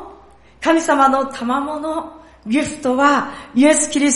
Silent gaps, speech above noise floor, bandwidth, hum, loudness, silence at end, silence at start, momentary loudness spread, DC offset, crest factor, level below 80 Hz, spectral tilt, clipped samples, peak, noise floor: none; 29 dB; 11.5 kHz; none; -17 LUFS; 0 s; 0 s; 11 LU; under 0.1%; 16 dB; -50 dBFS; -2.5 dB/octave; under 0.1%; -2 dBFS; -45 dBFS